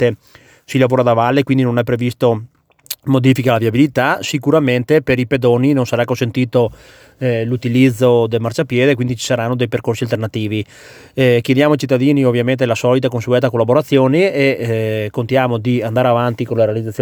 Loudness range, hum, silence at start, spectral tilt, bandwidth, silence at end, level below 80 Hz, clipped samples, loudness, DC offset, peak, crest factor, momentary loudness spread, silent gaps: 2 LU; none; 0 s; -6.5 dB/octave; over 20 kHz; 0 s; -50 dBFS; under 0.1%; -15 LUFS; under 0.1%; 0 dBFS; 14 dB; 7 LU; none